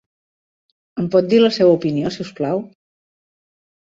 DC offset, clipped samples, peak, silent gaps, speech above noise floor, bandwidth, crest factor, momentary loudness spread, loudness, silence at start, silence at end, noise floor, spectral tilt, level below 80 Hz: under 0.1%; under 0.1%; -2 dBFS; none; over 74 dB; 7.8 kHz; 18 dB; 12 LU; -17 LUFS; 0.95 s; 1.25 s; under -90 dBFS; -7 dB/octave; -60 dBFS